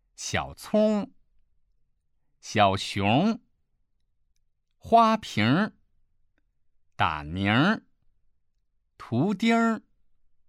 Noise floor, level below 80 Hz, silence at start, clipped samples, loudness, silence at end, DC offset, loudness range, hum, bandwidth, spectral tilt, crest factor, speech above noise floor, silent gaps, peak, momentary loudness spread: -71 dBFS; -58 dBFS; 0.2 s; under 0.1%; -25 LUFS; 0.7 s; under 0.1%; 4 LU; none; 13 kHz; -5.5 dB/octave; 20 dB; 47 dB; none; -6 dBFS; 10 LU